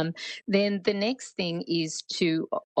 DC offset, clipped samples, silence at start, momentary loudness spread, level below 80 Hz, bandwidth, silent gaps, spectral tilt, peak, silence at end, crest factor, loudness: under 0.1%; under 0.1%; 0 s; 6 LU; -74 dBFS; 9.2 kHz; 2.64-2.76 s; -4.5 dB/octave; -10 dBFS; 0 s; 18 dB; -28 LUFS